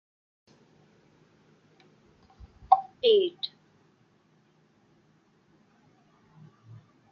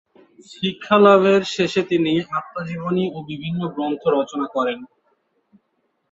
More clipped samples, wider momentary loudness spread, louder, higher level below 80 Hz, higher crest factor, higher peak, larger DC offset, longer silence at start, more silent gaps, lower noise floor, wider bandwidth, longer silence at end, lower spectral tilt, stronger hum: neither; about the same, 15 LU vs 14 LU; second, -25 LUFS vs -20 LUFS; about the same, -66 dBFS vs -62 dBFS; first, 28 dB vs 18 dB; about the same, -4 dBFS vs -2 dBFS; neither; first, 2.7 s vs 0.5 s; neither; second, -65 dBFS vs -70 dBFS; second, 6 kHz vs 8 kHz; first, 3.65 s vs 1.25 s; second, -2 dB/octave vs -6 dB/octave; neither